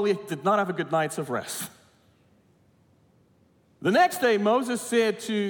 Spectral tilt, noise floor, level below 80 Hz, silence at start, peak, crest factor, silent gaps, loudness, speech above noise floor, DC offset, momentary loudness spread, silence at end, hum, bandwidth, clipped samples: -4.5 dB/octave; -62 dBFS; -76 dBFS; 0 s; -10 dBFS; 18 dB; none; -25 LUFS; 38 dB; under 0.1%; 9 LU; 0 s; none; 18 kHz; under 0.1%